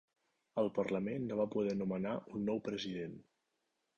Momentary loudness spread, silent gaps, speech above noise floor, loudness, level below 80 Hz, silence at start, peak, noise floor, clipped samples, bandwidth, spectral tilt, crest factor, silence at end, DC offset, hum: 8 LU; none; 47 dB; -38 LUFS; -72 dBFS; 0.55 s; -22 dBFS; -84 dBFS; under 0.1%; 7.6 kHz; -7 dB/octave; 16 dB; 0.75 s; under 0.1%; none